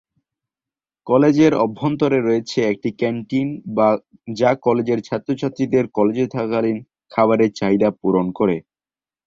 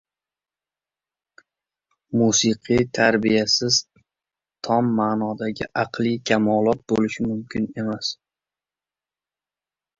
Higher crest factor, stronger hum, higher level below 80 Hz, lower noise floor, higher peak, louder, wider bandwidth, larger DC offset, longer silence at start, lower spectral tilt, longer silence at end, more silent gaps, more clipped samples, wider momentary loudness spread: second, 16 dB vs 22 dB; second, none vs 50 Hz at -55 dBFS; about the same, -58 dBFS vs -56 dBFS; about the same, under -90 dBFS vs under -90 dBFS; about the same, -2 dBFS vs -2 dBFS; about the same, -19 LUFS vs -21 LUFS; about the same, 7.6 kHz vs 7.8 kHz; neither; second, 1.05 s vs 2.1 s; first, -7 dB/octave vs -4 dB/octave; second, 0.65 s vs 1.85 s; neither; neither; about the same, 8 LU vs 9 LU